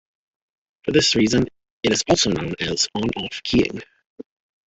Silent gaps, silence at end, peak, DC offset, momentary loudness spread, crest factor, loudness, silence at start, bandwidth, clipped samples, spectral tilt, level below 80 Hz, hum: 1.71-1.80 s, 4.06-4.16 s; 0.45 s; -2 dBFS; under 0.1%; 10 LU; 20 dB; -20 LUFS; 0.85 s; 8.4 kHz; under 0.1%; -3.5 dB/octave; -46 dBFS; none